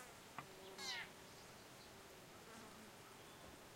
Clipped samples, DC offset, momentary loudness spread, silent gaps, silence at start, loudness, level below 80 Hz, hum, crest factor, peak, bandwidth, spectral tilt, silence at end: under 0.1%; under 0.1%; 11 LU; none; 0 s; -54 LUFS; -76 dBFS; none; 22 dB; -34 dBFS; 16 kHz; -2 dB/octave; 0 s